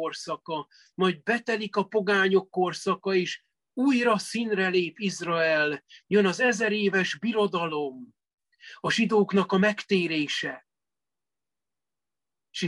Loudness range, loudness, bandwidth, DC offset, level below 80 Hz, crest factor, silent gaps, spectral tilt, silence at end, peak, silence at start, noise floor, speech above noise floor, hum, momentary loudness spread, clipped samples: 2 LU; -26 LUFS; 12 kHz; under 0.1%; -74 dBFS; 18 dB; 8.34-8.38 s; -5 dB/octave; 0 s; -10 dBFS; 0 s; under -90 dBFS; over 64 dB; none; 12 LU; under 0.1%